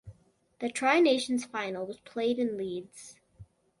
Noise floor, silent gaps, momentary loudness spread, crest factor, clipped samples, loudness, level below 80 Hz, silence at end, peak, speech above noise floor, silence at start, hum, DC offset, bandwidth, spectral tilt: -61 dBFS; none; 19 LU; 20 dB; under 0.1%; -30 LUFS; -68 dBFS; 0.35 s; -12 dBFS; 32 dB; 0.05 s; none; under 0.1%; 11.5 kHz; -4 dB/octave